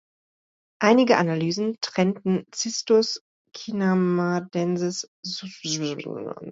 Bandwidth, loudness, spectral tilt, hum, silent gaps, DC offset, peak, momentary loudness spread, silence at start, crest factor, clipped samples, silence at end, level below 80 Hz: 8 kHz; -24 LUFS; -5 dB/octave; none; 3.21-3.45 s, 5.08-5.23 s; under 0.1%; -4 dBFS; 13 LU; 0.8 s; 20 dB; under 0.1%; 0 s; -70 dBFS